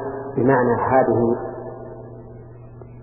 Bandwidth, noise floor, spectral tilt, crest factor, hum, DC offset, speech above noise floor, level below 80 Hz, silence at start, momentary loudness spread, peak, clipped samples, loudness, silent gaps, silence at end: 2.9 kHz; -40 dBFS; -14 dB/octave; 18 dB; none; under 0.1%; 22 dB; -48 dBFS; 0 s; 24 LU; -4 dBFS; under 0.1%; -19 LUFS; none; 0 s